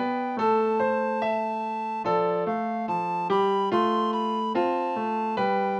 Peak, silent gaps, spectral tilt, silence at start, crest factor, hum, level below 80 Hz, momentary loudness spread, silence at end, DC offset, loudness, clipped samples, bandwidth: -12 dBFS; none; -7 dB/octave; 0 s; 12 dB; none; -76 dBFS; 5 LU; 0 s; under 0.1%; -26 LUFS; under 0.1%; 8.4 kHz